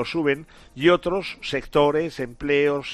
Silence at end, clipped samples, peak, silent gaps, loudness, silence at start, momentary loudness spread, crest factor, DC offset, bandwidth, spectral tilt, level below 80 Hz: 0 s; under 0.1%; -6 dBFS; none; -23 LUFS; 0 s; 9 LU; 18 dB; under 0.1%; 13 kHz; -6 dB/octave; -48 dBFS